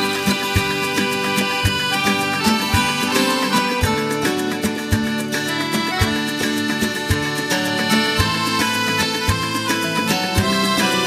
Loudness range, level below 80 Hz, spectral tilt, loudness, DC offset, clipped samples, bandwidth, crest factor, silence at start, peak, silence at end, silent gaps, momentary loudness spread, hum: 2 LU; -36 dBFS; -3.5 dB/octave; -18 LUFS; under 0.1%; under 0.1%; 15.5 kHz; 18 dB; 0 s; 0 dBFS; 0 s; none; 3 LU; none